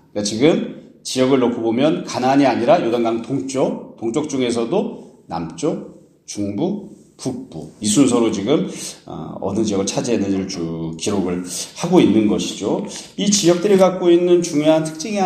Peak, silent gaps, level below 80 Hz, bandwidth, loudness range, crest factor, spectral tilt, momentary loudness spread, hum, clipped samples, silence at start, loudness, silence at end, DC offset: 0 dBFS; none; -56 dBFS; 14.5 kHz; 7 LU; 18 dB; -5 dB/octave; 15 LU; none; under 0.1%; 0.15 s; -18 LUFS; 0 s; under 0.1%